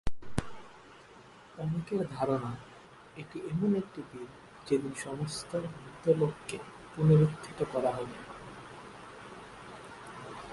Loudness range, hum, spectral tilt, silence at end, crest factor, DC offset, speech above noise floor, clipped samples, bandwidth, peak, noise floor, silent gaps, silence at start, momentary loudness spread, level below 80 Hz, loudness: 7 LU; none; -7 dB/octave; 0 s; 20 dB; under 0.1%; 23 dB; under 0.1%; 11.5 kHz; -12 dBFS; -54 dBFS; none; 0.05 s; 22 LU; -54 dBFS; -32 LUFS